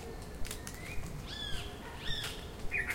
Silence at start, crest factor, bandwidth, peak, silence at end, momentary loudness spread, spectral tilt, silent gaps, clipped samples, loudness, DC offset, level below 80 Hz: 0 s; 18 dB; 17 kHz; -20 dBFS; 0 s; 7 LU; -3 dB/octave; none; under 0.1%; -41 LUFS; under 0.1%; -46 dBFS